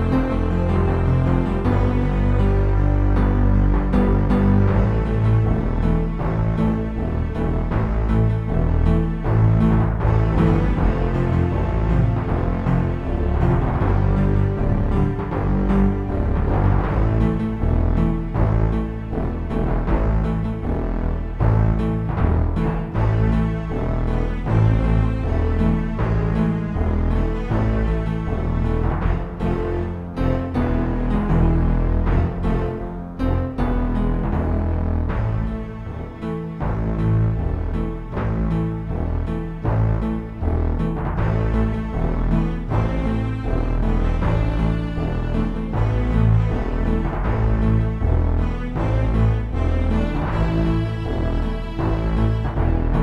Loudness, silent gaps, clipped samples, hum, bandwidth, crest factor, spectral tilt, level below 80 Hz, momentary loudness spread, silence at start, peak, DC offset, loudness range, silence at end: -21 LUFS; none; under 0.1%; none; 5.4 kHz; 14 dB; -10 dB/octave; -22 dBFS; 6 LU; 0 s; -4 dBFS; under 0.1%; 4 LU; 0 s